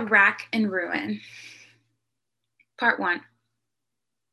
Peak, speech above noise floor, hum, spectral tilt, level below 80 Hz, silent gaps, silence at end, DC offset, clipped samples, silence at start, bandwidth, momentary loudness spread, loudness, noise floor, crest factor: -6 dBFS; 62 dB; none; -5 dB/octave; -78 dBFS; none; 1.1 s; under 0.1%; under 0.1%; 0 s; 12 kHz; 23 LU; -24 LUFS; -86 dBFS; 22 dB